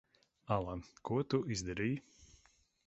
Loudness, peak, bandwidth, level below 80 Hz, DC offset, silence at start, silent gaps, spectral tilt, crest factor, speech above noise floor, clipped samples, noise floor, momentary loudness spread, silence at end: -38 LUFS; -18 dBFS; 8 kHz; -60 dBFS; under 0.1%; 0.5 s; none; -6 dB/octave; 20 dB; 33 dB; under 0.1%; -71 dBFS; 9 LU; 0.6 s